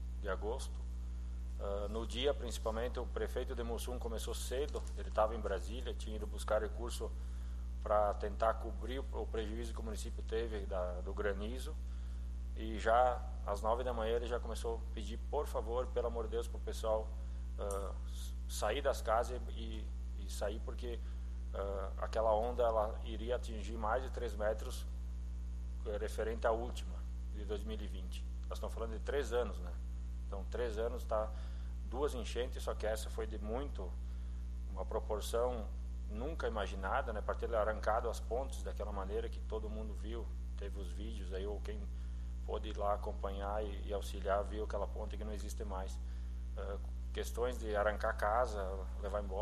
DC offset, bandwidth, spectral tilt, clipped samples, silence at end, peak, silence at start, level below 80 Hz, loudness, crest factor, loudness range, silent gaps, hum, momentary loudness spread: under 0.1%; 13 kHz; -5.5 dB/octave; under 0.1%; 0 s; -20 dBFS; 0 s; -42 dBFS; -40 LUFS; 20 dB; 4 LU; none; 60 Hz at -40 dBFS; 9 LU